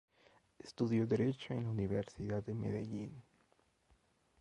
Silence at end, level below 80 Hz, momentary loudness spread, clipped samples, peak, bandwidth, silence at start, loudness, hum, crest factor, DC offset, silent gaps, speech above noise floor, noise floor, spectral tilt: 1.2 s; -64 dBFS; 17 LU; under 0.1%; -22 dBFS; 10.5 kHz; 0.65 s; -39 LUFS; none; 18 dB; under 0.1%; none; 37 dB; -74 dBFS; -8 dB/octave